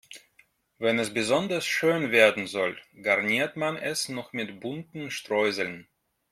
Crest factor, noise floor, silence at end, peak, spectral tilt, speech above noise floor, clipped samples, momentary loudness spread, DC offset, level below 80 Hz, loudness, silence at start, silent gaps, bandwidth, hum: 24 dB; -64 dBFS; 0.5 s; -4 dBFS; -3.5 dB/octave; 37 dB; under 0.1%; 14 LU; under 0.1%; -70 dBFS; -26 LUFS; 0.1 s; none; 16 kHz; none